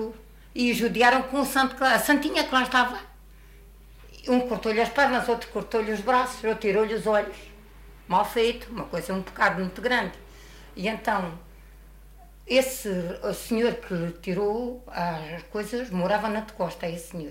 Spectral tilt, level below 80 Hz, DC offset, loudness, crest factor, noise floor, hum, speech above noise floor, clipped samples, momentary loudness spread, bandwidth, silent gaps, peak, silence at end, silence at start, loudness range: -4.5 dB/octave; -50 dBFS; under 0.1%; -25 LUFS; 20 dB; -49 dBFS; none; 23 dB; under 0.1%; 12 LU; 16 kHz; none; -6 dBFS; 0 s; 0 s; 6 LU